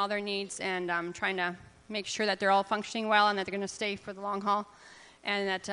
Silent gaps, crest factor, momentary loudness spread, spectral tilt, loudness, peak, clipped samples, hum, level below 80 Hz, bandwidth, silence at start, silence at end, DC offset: none; 22 dB; 11 LU; -3 dB/octave; -31 LUFS; -10 dBFS; under 0.1%; none; -70 dBFS; 10.5 kHz; 0 s; 0 s; under 0.1%